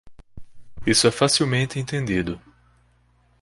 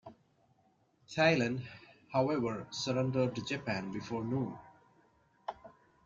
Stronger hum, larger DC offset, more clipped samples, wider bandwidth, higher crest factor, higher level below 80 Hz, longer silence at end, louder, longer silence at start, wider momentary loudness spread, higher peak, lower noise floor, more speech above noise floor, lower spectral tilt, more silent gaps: first, 60 Hz at -45 dBFS vs none; neither; neither; first, 11.5 kHz vs 7.6 kHz; about the same, 20 dB vs 22 dB; first, -48 dBFS vs -70 dBFS; first, 1.05 s vs 0.35 s; first, -21 LUFS vs -34 LUFS; about the same, 0.05 s vs 0.05 s; second, 12 LU vs 18 LU; first, -4 dBFS vs -14 dBFS; second, -60 dBFS vs -71 dBFS; about the same, 39 dB vs 38 dB; second, -4 dB/octave vs -5.5 dB/octave; neither